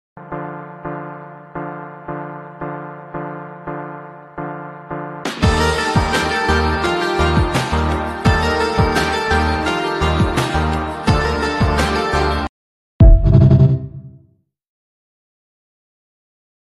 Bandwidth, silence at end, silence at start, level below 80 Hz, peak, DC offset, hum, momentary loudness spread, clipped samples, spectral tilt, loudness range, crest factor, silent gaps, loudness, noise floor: 13 kHz; 2.45 s; 0.15 s; -24 dBFS; 0 dBFS; under 0.1%; none; 17 LU; under 0.1%; -6 dB/octave; 14 LU; 18 dB; 12.49-12.99 s; -16 LUFS; -56 dBFS